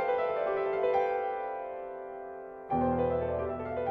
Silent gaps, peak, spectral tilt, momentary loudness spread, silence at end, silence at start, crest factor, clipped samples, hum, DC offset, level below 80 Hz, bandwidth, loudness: none; -16 dBFS; -9 dB/octave; 13 LU; 0 s; 0 s; 16 dB; under 0.1%; none; under 0.1%; -54 dBFS; 5.8 kHz; -32 LUFS